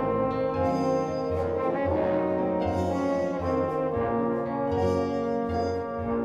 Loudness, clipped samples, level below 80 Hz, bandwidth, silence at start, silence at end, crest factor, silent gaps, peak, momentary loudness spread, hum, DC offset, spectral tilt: -27 LUFS; under 0.1%; -48 dBFS; 9.4 kHz; 0 s; 0 s; 14 dB; none; -14 dBFS; 3 LU; none; under 0.1%; -8 dB/octave